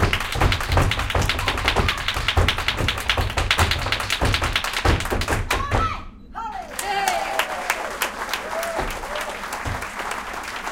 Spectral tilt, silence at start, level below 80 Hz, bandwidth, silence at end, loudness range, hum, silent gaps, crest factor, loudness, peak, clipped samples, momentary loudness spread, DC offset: -3.5 dB/octave; 0 s; -30 dBFS; 17 kHz; 0 s; 4 LU; none; none; 20 dB; -22 LUFS; -2 dBFS; under 0.1%; 8 LU; under 0.1%